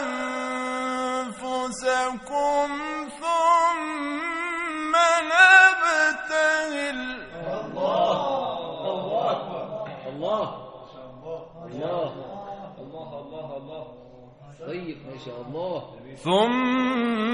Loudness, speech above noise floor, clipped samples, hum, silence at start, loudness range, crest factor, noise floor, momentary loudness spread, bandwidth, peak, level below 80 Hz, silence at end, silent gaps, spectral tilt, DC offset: -23 LUFS; 22 dB; under 0.1%; none; 0 s; 17 LU; 22 dB; -47 dBFS; 19 LU; 10 kHz; -2 dBFS; -60 dBFS; 0 s; none; -3.5 dB/octave; under 0.1%